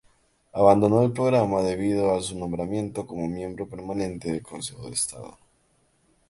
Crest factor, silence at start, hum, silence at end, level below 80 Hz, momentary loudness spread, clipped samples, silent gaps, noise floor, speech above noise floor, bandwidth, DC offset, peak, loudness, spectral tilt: 22 dB; 0.55 s; none; 1 s; -52 dBFS; 16 LU; under 0.1%; none; -66 dBFS; 42 dB; 11.5 kHz; under 0.1%; -4 dBFS; -25 LUFS; -6 dB/octave